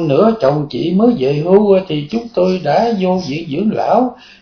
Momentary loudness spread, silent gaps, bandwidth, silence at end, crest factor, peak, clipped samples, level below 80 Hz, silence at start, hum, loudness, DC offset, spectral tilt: 8 LU; none; 5.4 kHz; 0.3 s; 14 dB; 0 dBFS; under 0.1%; -48 dBFS; 0 s; none; -14 LUFS; under 0.1%; -8 dB/octave